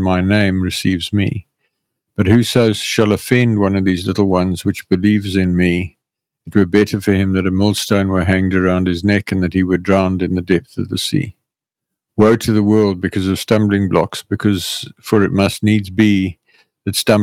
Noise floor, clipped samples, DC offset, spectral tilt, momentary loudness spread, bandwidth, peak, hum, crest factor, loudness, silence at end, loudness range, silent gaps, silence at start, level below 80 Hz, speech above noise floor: -82 dBFS; under 0.1%; under 0.1%; -6 dB/octave; 7 LU; 16.5 kHz; 0 dBFS; none; 14 dB; -15 LUFS; 0 s; 2 LU; none; 0 s; -44 dBFS; 67 dB